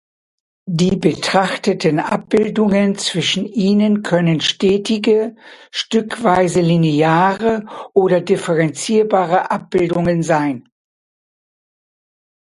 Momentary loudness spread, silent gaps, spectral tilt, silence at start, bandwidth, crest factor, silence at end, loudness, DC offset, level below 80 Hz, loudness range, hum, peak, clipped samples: 5 LU; none; -5.5 dB/octave; 0.65 s; 11.5 kHz; 16 dB; 1.85 s; -16 LUFS; under 0.1%; -50 dBFS; 2 LU; none; 0 dBFS; under 0.1%